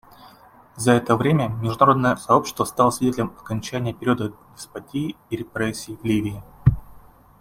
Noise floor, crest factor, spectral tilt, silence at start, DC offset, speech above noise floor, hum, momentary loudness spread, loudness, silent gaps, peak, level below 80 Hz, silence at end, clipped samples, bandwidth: -49 dBFS; 20 dB; -6 dB/octave; 0.25 s; under 0.1%; 28 dB; none; 13 LU; -22 LUFS; none; -2 dBFS; -44 dBFS; 0.45 s; under 0.1%; 16.5 kHz